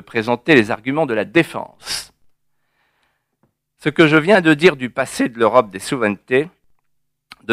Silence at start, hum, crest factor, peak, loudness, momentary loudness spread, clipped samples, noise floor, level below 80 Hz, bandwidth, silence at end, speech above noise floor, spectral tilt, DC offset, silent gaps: 0.15 s; none; 18 dB; 0 dBFS; -16 LUFS; 13 LU; under 0.1%; -71 dBFS; -56 dBFS; 15.5 kHz; 0 s; 55 dB; -5 dB/octave; under 0.1%; none